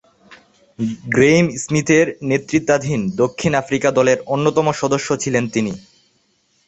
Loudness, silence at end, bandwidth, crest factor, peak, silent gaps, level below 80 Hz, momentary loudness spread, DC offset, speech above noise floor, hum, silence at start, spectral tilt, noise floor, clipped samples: -17 LUFS; 0.85 s; 8.4 kHz; 16 dB; -2 dBFS; none; -52 dBFS; 8 LU; under 0.1%; 45 dB; none; 0.3 s; -5.5 dB/octave; -62 dBFS; under 0.1%